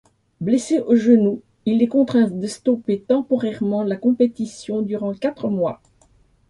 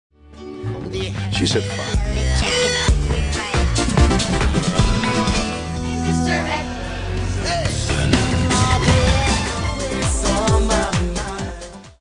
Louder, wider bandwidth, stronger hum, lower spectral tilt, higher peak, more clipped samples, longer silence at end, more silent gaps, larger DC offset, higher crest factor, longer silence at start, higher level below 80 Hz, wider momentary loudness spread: about the same, -20 LUFS vs -19 LUFS; about the same, 11 kHz vs 10.5 kHz; neither; first, -7 dB/octave vs -4.5 dB/octave; about the same, -4 dBFS vs -4 dBFS; neither; first, 0.75 s vs 0.1 s; neither; neither; about the same, 16 dB vs 16 dB; about the same, 0.4 s vs 0.3 s; second, -62 dBFS vs -24 dBFS; about the same, 9 LU vs 10 LU